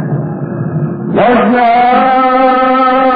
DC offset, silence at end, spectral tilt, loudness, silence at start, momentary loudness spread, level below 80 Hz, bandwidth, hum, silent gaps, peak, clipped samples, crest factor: under 0.1%; 0 s; -10 dB/octave; -10 LUFS; 0 s; 9 LU; -44 dBFS; 5 kHz; none; none; 0 dBFS; under 0.1%; 10 dB